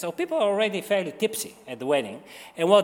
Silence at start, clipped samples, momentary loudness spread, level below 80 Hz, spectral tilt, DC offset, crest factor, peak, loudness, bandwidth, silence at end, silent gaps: 0 s; under 0.1%; 13 LU; -76 dBFS; -4 dB/octave; under 0.1%; 20 dB; -6 dBFS; -26 LUFS; 18 kHz; 0 s; none